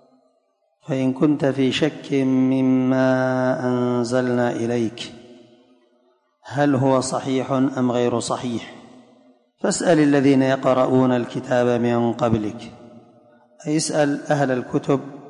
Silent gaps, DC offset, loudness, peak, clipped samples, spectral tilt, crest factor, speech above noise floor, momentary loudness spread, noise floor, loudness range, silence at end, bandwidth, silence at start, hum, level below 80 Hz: none; under 0.1%; -20 LUFS; -6 dBFS; under 0.1%; -6 dB/octave; 14 dB; 47 dB; 10 LU; -67 dBFS; 4 LU; 0 s; 11 kHz; 0.9 s; none; -58 dBFS